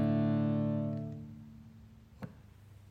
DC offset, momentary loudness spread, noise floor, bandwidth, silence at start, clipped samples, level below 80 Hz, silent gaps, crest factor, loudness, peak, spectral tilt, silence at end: under 0.1%; 23 LU; -56 dBFS; 4.9 kHz; 0 s; under 0.1%; -62 dBFS; none; 14 dB; -33 LUFS; -20 dBFS; -10.5 dB/octave; 0 s